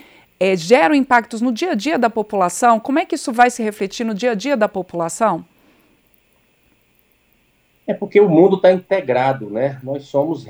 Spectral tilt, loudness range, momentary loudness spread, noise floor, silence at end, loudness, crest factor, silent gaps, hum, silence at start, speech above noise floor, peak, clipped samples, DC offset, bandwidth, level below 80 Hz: -5 dB/octave; 7 LU; 10 LU; -59 dBFS; 0 s; -17 LUFS; 18 dB; none; 60 Hz at -50 dBFS; 0.4 s; 43 dB; 0 dBFS; under 0.1%; under 0.1%; over 20 kHz; -62 dBFS